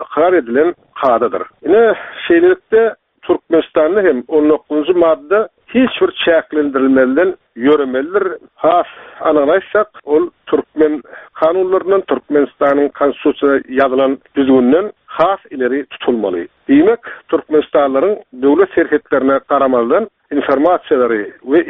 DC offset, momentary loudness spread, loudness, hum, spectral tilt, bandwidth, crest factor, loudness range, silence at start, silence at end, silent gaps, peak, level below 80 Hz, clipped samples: under 0.1%; 7 LU; -14 LUFS; none; -3.5 dB/octave; 4 kHz; 14 dB; 2 LU; 0 s; 0 s; none; 0 dBFS; -54 dBFS; under 0.1%